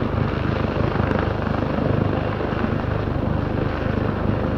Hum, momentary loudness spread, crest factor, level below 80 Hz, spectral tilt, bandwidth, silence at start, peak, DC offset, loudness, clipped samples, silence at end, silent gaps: none; 2 LU; 16 dB; -32 dBFS; -9 dB/octave; 6.4 kHz; 0 s; -6 dBFS; under 0.1%; -23 LUFS; under 0.1%; 0 s; none